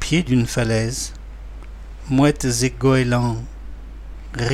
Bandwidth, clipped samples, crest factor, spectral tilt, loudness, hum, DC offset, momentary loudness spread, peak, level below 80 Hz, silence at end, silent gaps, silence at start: 14 kHz; under 0.1%; 16 dB; -5.5 dB/octave; -20 LUFS; none; under 0.1%; 21 LU; -4 dBFS; -34 dBFS; 0 s; none; 0 s